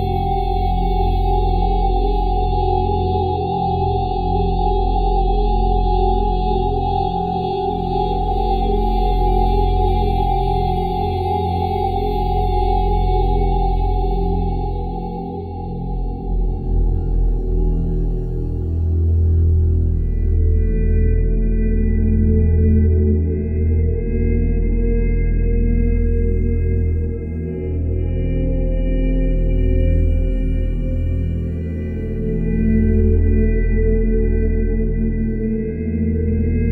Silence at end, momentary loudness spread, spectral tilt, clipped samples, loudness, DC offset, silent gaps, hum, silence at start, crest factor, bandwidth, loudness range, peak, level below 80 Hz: 0 s; 6 LU; -10.5 dB/octave; under 0.1%; -19 LUFS; under 0.1%; none; none; 0 s; 12 dB; 4.8 kHz; 4 LU; -4 dBFS; -20 dBFS